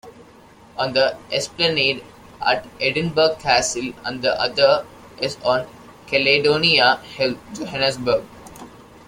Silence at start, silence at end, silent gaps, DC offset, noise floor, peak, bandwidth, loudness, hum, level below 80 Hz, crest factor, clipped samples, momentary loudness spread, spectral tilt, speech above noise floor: 0.05 s; 0.3 s; none; under 0.1%; -47 dBFS; 0 dBFS; 16.5 kHz; -19 LUFS; none; -52 dBFS; 20 dB; under 0.1%; 14 LU; -3 dB/octave; 27 dB